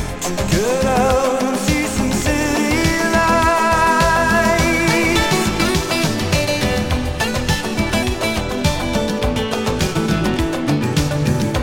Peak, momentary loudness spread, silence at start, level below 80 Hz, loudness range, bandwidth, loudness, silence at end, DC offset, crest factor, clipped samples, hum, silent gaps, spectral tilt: -2 dBFS; 5 LU; 0 s; -28 dBFS; 4 LU; 17 kHz; -17 LUFS; 0 s; under 0.1%; 14 dB; under 0.1%; none; none; -4.5 dB/octave